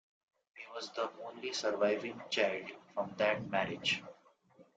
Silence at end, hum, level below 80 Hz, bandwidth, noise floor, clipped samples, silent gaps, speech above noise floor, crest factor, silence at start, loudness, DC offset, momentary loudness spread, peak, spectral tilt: 0.15 s; none; -76 dBFS; 9.2 kHz; -65 dBFS; under 0.1%; none; 29 dB; 20 dB; 0.55 s; -36 LUFS; under 0.1%; 11 LU; -16 dBFS; -3.5 dB/octave